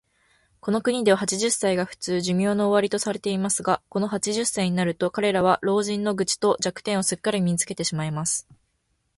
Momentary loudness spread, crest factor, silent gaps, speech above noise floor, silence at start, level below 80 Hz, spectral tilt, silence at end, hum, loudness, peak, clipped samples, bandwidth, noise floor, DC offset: 5 LU; 18 dB; none; 48 dB; 0.65 s; -60 dBFS; -4 dB/octave; 0.75 s; none; -23 LUFS; -6 dBFS; under 0.1%; 12 kHz; -72 dBFS; under 0.1%